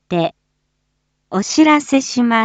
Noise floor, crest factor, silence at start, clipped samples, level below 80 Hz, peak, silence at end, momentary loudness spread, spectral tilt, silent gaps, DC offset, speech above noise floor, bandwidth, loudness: -69 dBFS; 16 dB; 0.1 s; under 0.1%; -60 dBFS; -2 dBFS; 0 s; 11 LU; -4 dB/octave; none; under 0.1%; 54 dB; 9 kHz; -15 LUFS